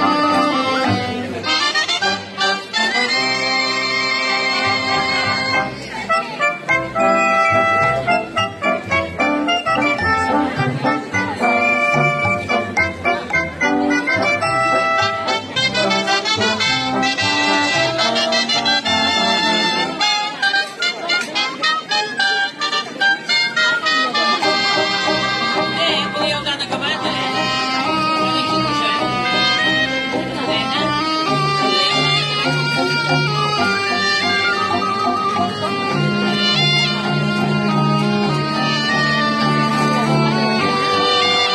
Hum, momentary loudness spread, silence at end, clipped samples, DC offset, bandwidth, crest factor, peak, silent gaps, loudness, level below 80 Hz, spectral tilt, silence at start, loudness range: none; 5 LU; 0 s; under 0.1%; under 0.1%; 13.5 kHz; 14 dB; -4 dBFS; none; -16 LUFS; -52 dBFS; -3.5 dB/octave; 0 s; 2 LU